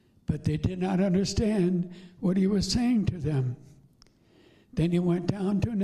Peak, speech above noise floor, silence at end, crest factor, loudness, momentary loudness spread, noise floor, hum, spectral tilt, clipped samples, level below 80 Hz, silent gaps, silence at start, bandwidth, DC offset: -10 dBFS; 34 dB; 0 s; 18 dB; -27 LUFS; 8 LU; -60 dBFS; none; -6.5 dB/octave; under 0.1%; -46 dBFS; none; 0.3 s; 12 kHz; under 0.1%